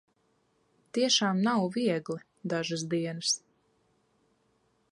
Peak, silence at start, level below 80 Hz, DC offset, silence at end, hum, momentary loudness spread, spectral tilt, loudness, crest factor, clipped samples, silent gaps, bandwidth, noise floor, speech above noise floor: -12 dBFS; 0.95 s; -76 dBFS; under 0.1%; 1.55 s; none; 11 LU; -3.5 dB/octave; -29 LUFS; 20 dB; under 0.1%; none; 11.5 kHz; -72 dBFS; 43 dB